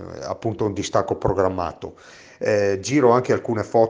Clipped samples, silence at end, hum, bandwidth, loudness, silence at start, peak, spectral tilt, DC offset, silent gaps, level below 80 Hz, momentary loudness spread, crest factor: under 0.1%; 0 s; none; 10 kHz; -21 LUFS; 0 s; -2 dBFS; -6 dB/octave; under 0.1%; none; -48 dBFS; 12 LU; 18 dB